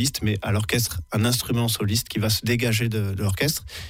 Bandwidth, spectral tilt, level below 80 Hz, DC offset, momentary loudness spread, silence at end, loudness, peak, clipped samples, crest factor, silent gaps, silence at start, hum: 16.5 kHz; -4.5 dB/octave; -44 dBFS; under 0.1%; 3 LU; 0 s; -23 LUFS; -8 dBFS; under 0.1%; 14 dB; none; 0 s; none